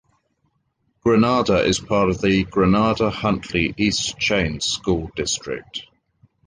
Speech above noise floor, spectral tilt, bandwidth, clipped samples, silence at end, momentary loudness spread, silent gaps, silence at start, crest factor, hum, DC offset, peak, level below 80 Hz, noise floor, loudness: 49 dB; -4.5 dB/octave; 10 kHz; under 0.1%; 0.65 s; 8 LU; none; 1.05 s; 16 dB; none; under 0.1%; -4 dBFS; -40 dBFS; -69 dBFS; -20 LUFS